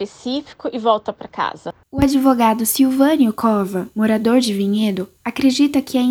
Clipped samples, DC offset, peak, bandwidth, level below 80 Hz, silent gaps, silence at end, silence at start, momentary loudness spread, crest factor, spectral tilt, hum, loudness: under 0.1%; under 0.1%; -2 dBFS; 19.5 kHz; -46 dBFS; none; 0 s; 0 s; 11 LU; 16 dB; -5 dB/octave; none; -17 LUFS